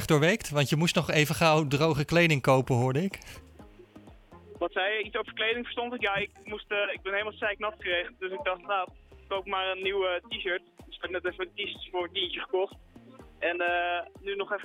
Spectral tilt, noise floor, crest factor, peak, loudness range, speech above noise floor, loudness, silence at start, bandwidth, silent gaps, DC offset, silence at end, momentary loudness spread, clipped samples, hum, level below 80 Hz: -5 dB/octave; -52 dBFS; 22 dB; -8 dBFS; 7 LU; 24 dB; -29 LUFS; 0 s; 17.5 kHz; none; under 0.1%; 0 s; 12 LU; under 0.1%; none; -56 dBFS